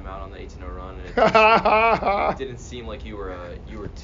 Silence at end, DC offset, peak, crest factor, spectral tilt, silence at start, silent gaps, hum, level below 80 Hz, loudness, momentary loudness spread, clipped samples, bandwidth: 0 s; under 0.1%; -4 dBFS; 18 dB; -3 dB/octave; 0 s; none; none; -38 dBFS; -18 LUFS; 21 LU; under 0.1%; 7.4 kHz